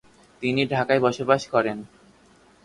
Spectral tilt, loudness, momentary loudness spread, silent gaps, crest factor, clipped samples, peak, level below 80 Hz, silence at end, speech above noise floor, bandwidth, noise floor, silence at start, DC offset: -5.5 dB/octave; -23 LUFS; 8 LU; none; 20 dB; under 0.1%; -6 dBFS; -62 dBFS; 0.8 s; 33 dB; 11.5 kHz; -56 dBFS; 0.4 s; under 0.1%